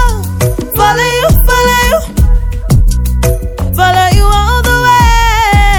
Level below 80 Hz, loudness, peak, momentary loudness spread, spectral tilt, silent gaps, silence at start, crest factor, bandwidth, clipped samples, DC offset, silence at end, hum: -12 dBFS; -10 LUFS; 0 dBFS; 6 LU; -4.5 dB/octave; none; 0 s; 8 dB; over 20 kHz; 1%; under 0.1%; 0 s; none